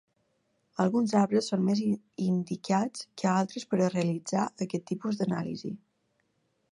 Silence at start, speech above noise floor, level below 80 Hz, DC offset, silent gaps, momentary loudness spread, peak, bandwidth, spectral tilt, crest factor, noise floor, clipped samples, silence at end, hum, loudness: 0.8 s; 46 dB; -74 dBFS; under 0.1%; none; 9 LU; -12 dBFS; 11 kHz; -6.5 dB/octave; 18 dB; -75 dBFS; under 0.1%; 0.95 s; none; -29 LUFS